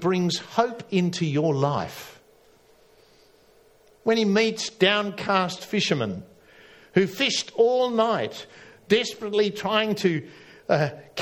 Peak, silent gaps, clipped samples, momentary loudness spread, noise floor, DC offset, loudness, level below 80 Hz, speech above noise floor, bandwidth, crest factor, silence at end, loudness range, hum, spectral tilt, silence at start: -4 dBFS; none; under 0.1%; 11 LU; -57 dBFS; under 0.1%; -24 LUFS; -66 dBFS; 33 dB; 17.5 kHz; 20 dB; 0 s; 4 LU; none; -5 dB/octave; 0 s